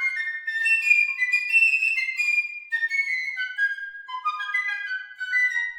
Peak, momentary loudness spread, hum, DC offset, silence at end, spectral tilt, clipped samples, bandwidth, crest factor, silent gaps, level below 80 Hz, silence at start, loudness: -8 dBFS; 12 LU; none; under 0.1%; 0 s; 6 dB/octave; under 0.1%; 17.5 kHz; 18 dB; none; -82 dBFS; 0 s; -22 LUFS